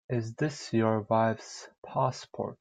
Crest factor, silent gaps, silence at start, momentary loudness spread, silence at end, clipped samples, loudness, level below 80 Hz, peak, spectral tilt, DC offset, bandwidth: 18 dB; 1.78-1.82 s; 0.1 s; 12 LU; 0.05 s; under 0.1%; -30 LUFS; -68 dBFS; -12 dBFS; -6.5 dB/octave; under 0.1%; 9.4 kHz